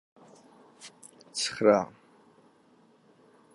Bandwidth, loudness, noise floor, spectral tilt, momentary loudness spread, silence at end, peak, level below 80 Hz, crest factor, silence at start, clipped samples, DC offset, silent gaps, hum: 11.5 kHz; -27 LUFS; -62 dBFS; -3.5 dB/octave; 26 LU; 1.7 s; -8 dBFS; -74 dBFS; 26 dB; 0.85 s; under 0.1%; under 0.1%; none; none